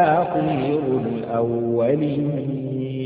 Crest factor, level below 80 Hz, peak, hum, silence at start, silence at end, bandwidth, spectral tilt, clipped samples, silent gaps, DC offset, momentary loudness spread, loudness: 16 dB; -56 dBFS; -6 dBFS; none; 0 s; 0 s; 4.8 kHz; -12.5 dB/octave; under 0.1%; none; under 0.1%; 6 LU; -22 LUFS